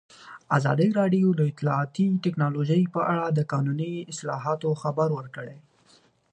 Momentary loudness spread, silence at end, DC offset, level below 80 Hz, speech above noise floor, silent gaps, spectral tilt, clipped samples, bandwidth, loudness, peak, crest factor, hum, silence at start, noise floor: 11 LU; 0.75 s; under 0.1%; -70 dBFS; 36 dB; none; -7.5 dB/octave; under 0.1%; 9.4 kHz; -25 LUFS; -8 dBFS; 16 dB; none; 0.2 s; -60 dBFS